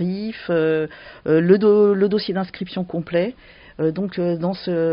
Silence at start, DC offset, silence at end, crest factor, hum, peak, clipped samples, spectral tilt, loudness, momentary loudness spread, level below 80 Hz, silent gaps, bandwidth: 0 s; under 0.1%; 0 s; 18 dB; none; -2 dBFS; under 0.1%; -6.5 dB/octave; -20 LUFS; 13 LU; -56 dBFS; none; 5.4 kHz